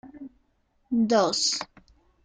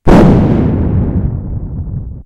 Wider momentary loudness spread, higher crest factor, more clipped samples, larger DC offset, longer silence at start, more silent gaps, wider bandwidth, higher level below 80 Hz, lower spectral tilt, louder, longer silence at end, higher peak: first, 22 LU vs 15 LU; first, 18 dB vs 10 dB; second, under 0.1% vs 1%; neither; about the same, 0.05 s vs 0.05 s; neither; about the same, 9.6 kHz vs 10.5 kHz; second, -64 dBFS vs -18 dBFS; second, -3 dB/octave vs -9 dB/octave; second, -24 LUFS vs -12 LUFS; first, 0.6 s vs 0.05 s; second, -10 dBFS vs 0 dBFS